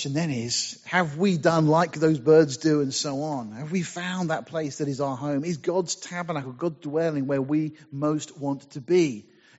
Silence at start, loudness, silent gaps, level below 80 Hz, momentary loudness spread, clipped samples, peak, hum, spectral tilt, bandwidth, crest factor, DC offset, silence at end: 0 s; -25 LUFS; none; -68 dBFS; 11 LU; under 0.1%; -6 dBFS; none; -5.5 dB/octave; 8 kHz; 18 dB; under 0.1%; 0.35 s